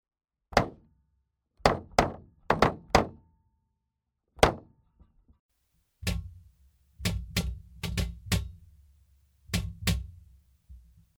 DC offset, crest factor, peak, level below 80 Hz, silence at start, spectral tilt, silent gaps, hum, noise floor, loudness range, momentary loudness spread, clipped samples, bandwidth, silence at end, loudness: under 0.1%; 30 dB; -2 dBFS; -42 dBFS; 0.5 s; -4.5 dB/octave; 5.39-5.49 s; none; -83 dBFS; 7 LU; 13 LU; under 0.1%; over 20 kHz; 0.4 s; -30 LUFS